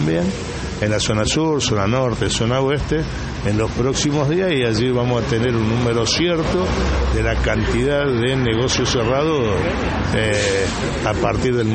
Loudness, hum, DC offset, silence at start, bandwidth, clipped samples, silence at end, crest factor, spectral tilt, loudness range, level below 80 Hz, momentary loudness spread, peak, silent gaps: -19 LUFS; none; under 0.1%; 0 s; 8.8 kHz; under 0.1%; 0 s; 14 dB; -5 dB/octave; 1 LU; -30 dBFS; 4 LU; -4 dBFS; none